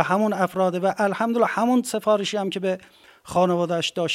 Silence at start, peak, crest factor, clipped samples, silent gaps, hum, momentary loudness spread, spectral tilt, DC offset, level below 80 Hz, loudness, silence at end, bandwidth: 0 s; -4 dBFS; 18 dB; under 0.1%; none; none; 5 LU; -5 dB/octave; under 0.1%; -66 dBFS; -23 LUFS; 0 s; 16 kHz